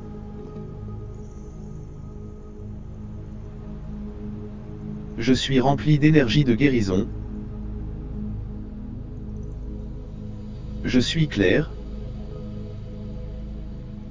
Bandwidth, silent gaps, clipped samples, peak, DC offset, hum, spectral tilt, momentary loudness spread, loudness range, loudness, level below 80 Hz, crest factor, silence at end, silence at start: 7.6 kHz; none; under 0.1%; -2 dBFS; under 0.1%; none; -6.5 dB/octave; 19 LU; 16 LU; -25 LUFS; -36 dBFS; 22 dB; 0 s; 0 s